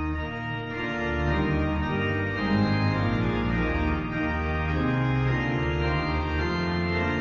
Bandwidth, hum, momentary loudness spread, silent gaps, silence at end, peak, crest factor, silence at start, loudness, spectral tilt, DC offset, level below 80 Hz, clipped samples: 7.4 kHz; none; 4 LU; none; 0 s; -14 dBFS; 12 dB; 0 s; -26 LUFS; -8 dB/octave; under 0.1%; -34 dBFS; under 0.1%